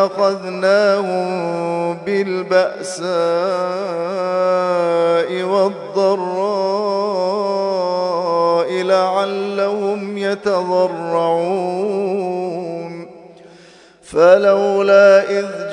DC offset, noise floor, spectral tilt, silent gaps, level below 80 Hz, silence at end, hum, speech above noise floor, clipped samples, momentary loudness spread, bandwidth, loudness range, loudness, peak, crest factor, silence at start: under 0.1%; -45 dBFS; -5.5 dB/octave; none; -66 dBFS; 0 s; none; 29 dB; under 0.1%; 9 LU; 11 kHz; 4 LU; -17 LUFS; 0 dBFS; 16 dB; 0 s